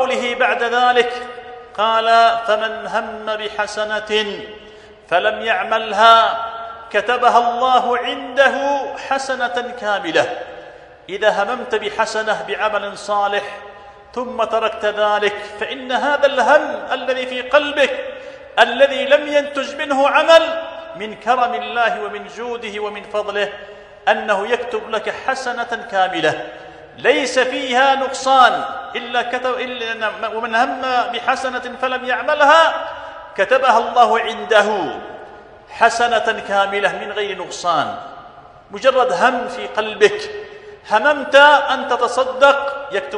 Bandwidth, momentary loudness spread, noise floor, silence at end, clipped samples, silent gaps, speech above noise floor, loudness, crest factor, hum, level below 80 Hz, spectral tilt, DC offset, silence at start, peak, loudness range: 11 kHz; 15 LU; -41 dBFS; 0 s; under 0.1%; none; 24 dB; -17 LUFS; 18 dB; none; -56 dBFS; -2.5 dB/octave; under 0.1%; 0 s; 0 dBFS; 6 LU